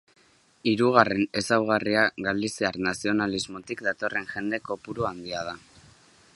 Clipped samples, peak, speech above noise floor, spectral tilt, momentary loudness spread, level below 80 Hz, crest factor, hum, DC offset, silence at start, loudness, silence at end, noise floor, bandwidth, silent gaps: under 0.1%; 0 dBFS; 30 dB; -4.5 dB/octave; 12 LU; -60 dBFS; 26 dB; none; under 0.1%; 0.65 s; -26 LUFS; 0.75 s; -56 dBFS; 11.5 kHz; none